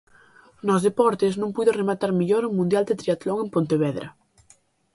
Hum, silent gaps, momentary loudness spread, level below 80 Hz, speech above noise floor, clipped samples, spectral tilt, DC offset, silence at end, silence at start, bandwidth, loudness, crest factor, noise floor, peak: none; none; 5 LU; -64 dBFS; 37 dB; under 0.1%; -7 dB/octave; under 0.1%; 0.85 s; 0.65 s; 11.5 kHz; -23 LUFS; 18 dB; -59 dBFS; -6 dBFS